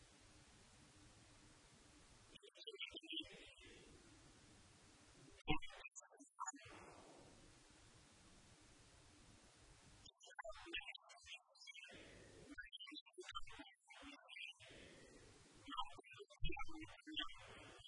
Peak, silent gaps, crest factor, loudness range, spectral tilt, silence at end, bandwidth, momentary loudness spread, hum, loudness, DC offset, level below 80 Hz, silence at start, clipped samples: -24 dBFS; 13.01-13.06 s; 30 dB; 6 LU; -3 dB/octave; 0 s; 10.5 kHz; 17 LU; none; -54 LUFS; under 0.1%; -64 dBFS; 0 s; under 0.1%